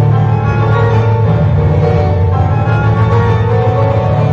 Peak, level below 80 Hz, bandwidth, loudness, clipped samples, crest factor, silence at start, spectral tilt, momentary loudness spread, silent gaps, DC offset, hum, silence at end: -2 dBFS; -26 dBFS; 6 kHz; -11 LUFS; under 0.1%; 8 dB; 0 s; -9.5 dB/octave; 1 LU; none; under 0.1%; none; 0 s